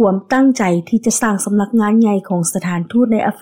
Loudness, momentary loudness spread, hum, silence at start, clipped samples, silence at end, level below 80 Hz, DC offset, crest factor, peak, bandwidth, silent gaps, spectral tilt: -15 LUFS; 5 LU; none; 0 s; under 0.1%; 0.05 s; -54 dBFS; under 0.1%; 10 dB; -4 dBFS; 16.5 kHz; none; -5.5 dB/octave